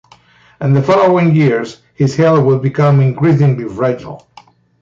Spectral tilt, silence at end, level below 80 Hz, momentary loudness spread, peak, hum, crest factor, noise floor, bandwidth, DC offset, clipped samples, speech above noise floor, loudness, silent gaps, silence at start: -8.5 dB/octave; 0.65 s; -50 dBFS; 10 LU; -2 dBFS; none; 10 dB; -46 dBFS; 7.6 kHz; under 0.1%; under 0.1%; 35 dB; -12 LUFS; none; 0.6 s